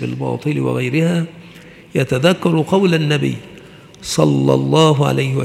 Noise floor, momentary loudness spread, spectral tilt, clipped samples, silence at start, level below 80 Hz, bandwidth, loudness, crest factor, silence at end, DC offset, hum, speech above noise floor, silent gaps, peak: -40 dBFS; 9 LU; -6 dB/octave; under 0.1%; 0 s; -52 dBFS; 14.5 kHz; -16 LUFS; 16 dB; 0 s; under 0.1%; none; 24 dB; none; 0 dBFS